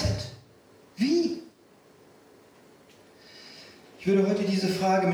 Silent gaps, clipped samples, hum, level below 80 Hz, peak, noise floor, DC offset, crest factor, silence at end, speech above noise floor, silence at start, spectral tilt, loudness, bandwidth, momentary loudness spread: none; under 0.1%; none; -50 dBFS; -12 dBFS; -57 dBFS; under 0.1%; 16 dB; 0 s; 33 dB; 0 s; -6 dB/octave; -26 LUFS; 15 kHz; 24 LU